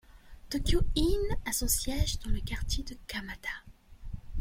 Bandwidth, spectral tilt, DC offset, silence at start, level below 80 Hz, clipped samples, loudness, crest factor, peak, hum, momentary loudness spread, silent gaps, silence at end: 16.5 kHz; -4 dB/octave; under 0.1%; 0.1 s; -36 dBFS; under 0.1%; -33 LUFS; 16 dB; -14 dBFS; none; 12 LU; none; 0 s